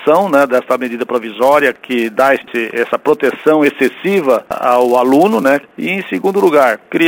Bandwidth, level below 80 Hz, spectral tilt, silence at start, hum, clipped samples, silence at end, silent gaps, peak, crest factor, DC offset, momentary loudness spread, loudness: over 20 kHz; -60 dBFS; -5.5 dB/octave; 0 s; none; under 0.1%; 0 s; none; 0 dBFS; 12 dB; under 0.1%; 7 LU; -13 LUFS